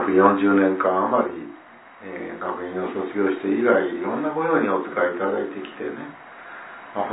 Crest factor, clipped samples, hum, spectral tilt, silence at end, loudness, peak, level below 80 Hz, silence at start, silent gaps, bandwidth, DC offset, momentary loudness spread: 20 dB; under 0.1%; none; -10.5 dB/octave; 0 s; -22 LUFS; -2 dBFS; -68 dBFS; 0 s; none; 4 kHz; under 0.1%; 20 LU